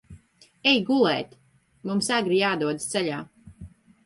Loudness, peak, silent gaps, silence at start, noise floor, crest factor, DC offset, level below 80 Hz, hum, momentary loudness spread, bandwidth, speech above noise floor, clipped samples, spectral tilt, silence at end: -24 LUFS; -8 dBFS; none; 0.1 s; -54 dBFS; 18 dB; under 0.1%; -58 dBFS; none; 16 LU; 11.5 kHz; 31 dB; under 0.1%; -4 dB/octave; 0.4 s